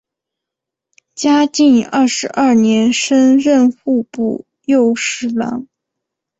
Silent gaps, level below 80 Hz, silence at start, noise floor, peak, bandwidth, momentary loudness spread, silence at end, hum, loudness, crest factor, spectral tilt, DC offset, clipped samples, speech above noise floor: none; -58 dBFS; 1.15 s; -83 dBFS; -2 dBFS; 8.2 kHz; 9 LU; 0.75 s; none; -13 LUFS; 12 dB; -4 dB/octave; under 0.1%; under 0.1%; 70 dB